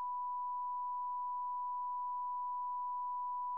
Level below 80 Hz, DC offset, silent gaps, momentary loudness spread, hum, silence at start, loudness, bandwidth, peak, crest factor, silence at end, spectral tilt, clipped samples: under -90 dBFS; under 0.1%; none; 0 LU; none; 0 s; -40 LUFS; 1.1 kHz; -36 dBFS; 4 dB; 0 s; -2 dB/octave; under 0.1%